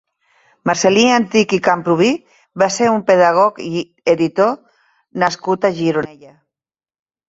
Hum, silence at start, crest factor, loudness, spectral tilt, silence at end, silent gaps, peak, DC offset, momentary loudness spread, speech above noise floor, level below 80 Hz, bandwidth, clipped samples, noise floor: none; 0.65 s; 16 dB; -15 LUFS; -4.5 dB/octave; 1.2 s; none; 0 dBFS; under 0.1%; 12 LU; over 75 dB; -58 dBFS; 8 kHz; under 0.1%; under -90 dBFS